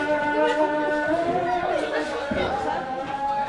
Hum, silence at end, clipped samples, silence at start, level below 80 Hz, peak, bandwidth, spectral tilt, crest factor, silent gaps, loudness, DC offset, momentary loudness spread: none; 0 s; under 0.1%; 0 s; -50 dBFS; -10 dBFS; 11 kHz; -5 dB/octave; 14 dB; none; -24 LUFS; under 0.1%; 6 LU